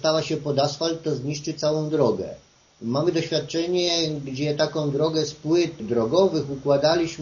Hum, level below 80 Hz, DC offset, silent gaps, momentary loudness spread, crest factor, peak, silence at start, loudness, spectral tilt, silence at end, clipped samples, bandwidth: none; -58 dBFS; under 0.1%; none; 7 LU; 18 dB; -6 dBFS; 0 s; -23 LUFS; -5 dB/octave; 0 s; under 0.1%; 7.2 kHz